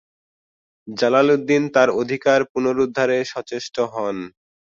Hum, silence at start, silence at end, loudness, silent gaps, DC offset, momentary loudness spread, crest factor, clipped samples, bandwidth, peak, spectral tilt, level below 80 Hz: none; 0.85 s; 0.45 s; -19 LUFS; 2.49-2.55 s; under 0.1%; 12 LU; 18 dB; under 0.1%; 7.6 kHz; -2 dBFS; -5 dB/octave; -62 dBFS